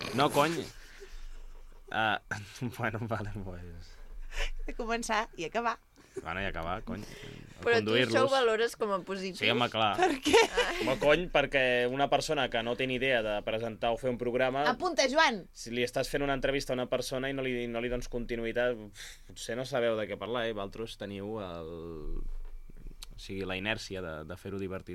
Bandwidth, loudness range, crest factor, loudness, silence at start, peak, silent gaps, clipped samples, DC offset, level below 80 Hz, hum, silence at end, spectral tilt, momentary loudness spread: 16 kHz; 10 LU; 22 dB; -31 LUFS; 0 s; -10 dBFS; none; under 0.1%; under 0.1%; -46 dBFS; none; 0 s; -4 dB/octave; 17 LU